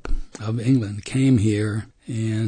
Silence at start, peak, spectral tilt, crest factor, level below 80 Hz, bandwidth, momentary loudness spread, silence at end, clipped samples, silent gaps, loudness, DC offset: 0.05 s; -8 dBFS; -7 dB/octave; 14 dB; -32 dBFS; 9.6 kHz; 13 LU; 0 s; under 0.1%; none; -22 LUFS; under 0.1%